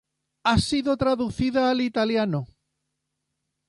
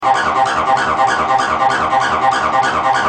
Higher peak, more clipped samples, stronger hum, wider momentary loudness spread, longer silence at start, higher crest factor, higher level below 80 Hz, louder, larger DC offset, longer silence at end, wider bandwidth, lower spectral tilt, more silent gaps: second, -8 dBFS vs -2 dBFS; neither; neither; first, 6 LU vs 1 LU; first, 0.45 s vs 0 s; first, 18 dB vs 12 dB; about the same, -44 dBFS vs -46 dBFS; second, -24 LUFS vs -14 LUFS; neither; first, 1.25 s vs 0 s; first, 11.5 kHz vs 10 kHz; first, -5.5 dB/octave vs -3 dB/octave; neither